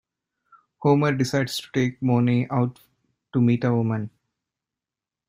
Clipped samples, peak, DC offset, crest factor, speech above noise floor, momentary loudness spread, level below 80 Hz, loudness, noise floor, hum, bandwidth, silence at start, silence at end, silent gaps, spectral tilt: under 0.1%; -6 dBFS; under 0.1%; 18 dB; 67 dB; 8 LU; -62 dBFS; -23 LUFS; -89 dBFS; none; 15.5 kHz; 0.8 s; 1.2 s; none; -7 dB/octave